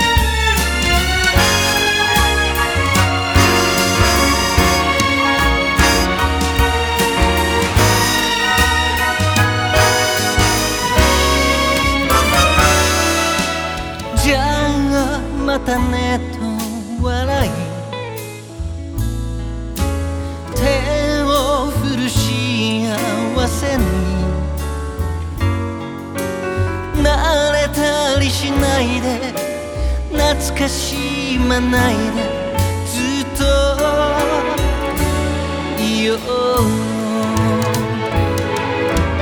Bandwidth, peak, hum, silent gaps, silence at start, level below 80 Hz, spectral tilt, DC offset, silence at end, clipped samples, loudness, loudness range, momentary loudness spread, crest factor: over 20 kHz; 0 dBFS; none; none; 0 s; -24 dBFS; -4 dB/octave; under 0.1%; 0 s; under 0.1%; -16 LUFS; 7 LU; 10 LU; 16 dB